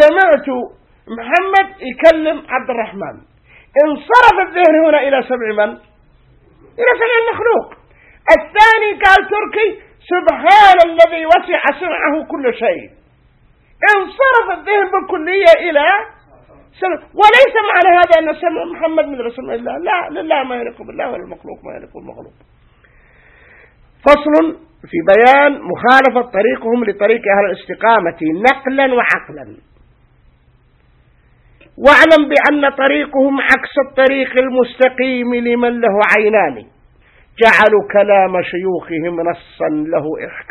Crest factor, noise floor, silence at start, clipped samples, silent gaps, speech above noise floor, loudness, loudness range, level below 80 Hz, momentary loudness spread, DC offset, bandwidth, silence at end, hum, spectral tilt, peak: 14 dB; -51 dBFS; 0 s; 0.5%; none; 39 dB; -12 LUFS; 7 LU; -46 dBFS; 14 LU; under 0.1%; 11.5 kHz; 0.1 s; none; -5 dB/octave; 0 dBFS